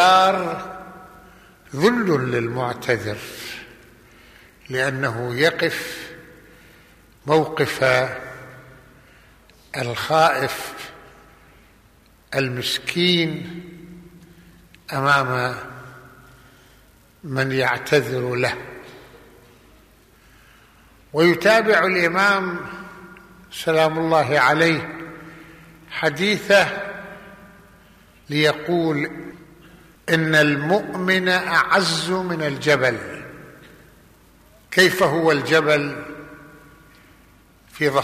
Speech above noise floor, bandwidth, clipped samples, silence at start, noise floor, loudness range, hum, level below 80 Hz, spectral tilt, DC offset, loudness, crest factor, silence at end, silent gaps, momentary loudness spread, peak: 34 dB; 15 kHz; under 0.1%; 0 s; -53 dBFS; 6 LU; none; -56 dBFS; -4.5 dB/octave; under 0.1%; -19 LUFS; 18 dB; 0 s; none; 21 LU; -4 dBFS